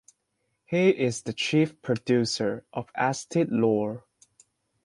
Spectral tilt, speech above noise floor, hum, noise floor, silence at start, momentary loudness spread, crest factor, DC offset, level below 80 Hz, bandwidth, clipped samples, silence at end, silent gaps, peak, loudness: -5.5 dB/octave; 51 dB; none; -77 dBFS; 0.7 s; 9 LU; 18 dB; under 0.1%; -66 dBFS; 11.5 kHz; under 0.1%; 0.85 s; none; -8 dBFS; -26 LUFS